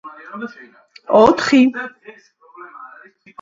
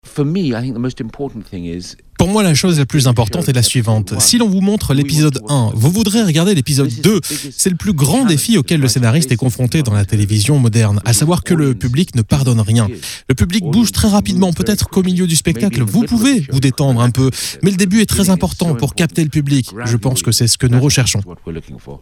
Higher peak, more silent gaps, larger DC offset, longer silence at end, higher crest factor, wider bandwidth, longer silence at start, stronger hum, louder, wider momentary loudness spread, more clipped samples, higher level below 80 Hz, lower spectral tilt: about the same, 0 dBFS vs 0 dBFS; neither; neither; first, 0.55 s vs 0.05 s; about the same, 18 dB vs 14 dB; second, 7.6 kHz vs 18.5 kHz; about the same, 0.05 s vs 0.05 s; neither; about the same, -13 LUFS vs -14 LUFS; first, 25 LU vs 8 LU; neither; second, -54 dBFS vs -34 dBFS; about the same, -5 dB/octave vs -5 dB/octave